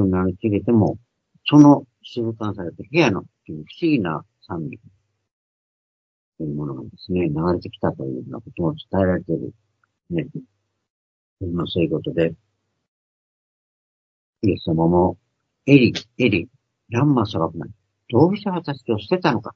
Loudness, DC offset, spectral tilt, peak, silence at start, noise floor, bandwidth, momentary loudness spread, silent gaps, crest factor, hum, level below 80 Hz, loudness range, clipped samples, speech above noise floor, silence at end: -21 LUFS; under 0.1%; -7.5 dB/octave; 0 dBFS; 0 s; under -90 dBFS; 6.8 kHz; 17 LU; 5.31-6.32 s, 10.90-11.37 s, 12.88-14.33 s; 22 dB; none; -54 dBFS; 9 LU; under 0.1%; over 70 dB; 0.05 s